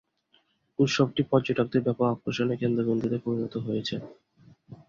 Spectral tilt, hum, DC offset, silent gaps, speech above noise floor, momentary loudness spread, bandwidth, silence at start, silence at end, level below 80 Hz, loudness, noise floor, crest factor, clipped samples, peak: -6.5 dB/octave; none; under 0.1%; none; 41 dB; 8 LU; 7.6 kHz; 0.8 s; 0.15 s; -62 dBFS; -27 LUFS; -68 dBFS; 20 dB; under 0.1%; -8 dBFS